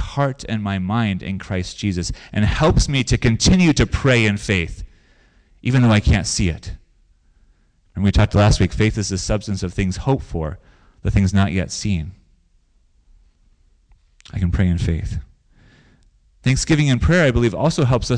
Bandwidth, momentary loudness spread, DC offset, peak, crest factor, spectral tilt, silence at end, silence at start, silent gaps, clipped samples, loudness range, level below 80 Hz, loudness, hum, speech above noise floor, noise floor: 10 kHz; 12 LU; under 0.1%; -6 dBFS; 12 dB; -5.5 dB/octave; 0 s; 0 s; none; under 0.1%; 8 LU; -28 dBFS; -19 LUFS; none; 40 dB; -57 dBFS